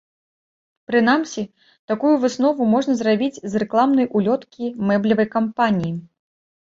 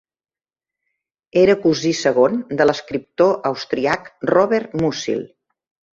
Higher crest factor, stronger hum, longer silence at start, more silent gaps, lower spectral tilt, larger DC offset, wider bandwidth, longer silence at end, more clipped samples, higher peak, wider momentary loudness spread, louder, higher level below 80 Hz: about the same, 16 dB vs 18 dB; neither; second, 0.9 s vs 1.35 s; first, 1.79-1.88 s vs none; about the same, -6 dB/octave vs -5 dB/octave; neither; about the same, 7.8 kHz vs 7.8 kHz; about the same, 0.65 s vs 0.65 s; neither; about the same, -4 dBFS vs -2 dBFS; about the same, 11 LU vs 9 LU; about the same, -19 LUFS vs -18 LUFS; second, -62 dBFS vs -56 dBFS